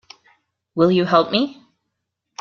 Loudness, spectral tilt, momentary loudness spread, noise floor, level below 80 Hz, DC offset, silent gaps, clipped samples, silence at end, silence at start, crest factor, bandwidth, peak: -18 LUFS; -6.5 dB/octave; 15 LU; -78 dBFS; -62 dBFS; under 0.1%; none; under 0.1%; 0.85 s; 0.75 s; 20 dB; 7 kHz; -2 dBFS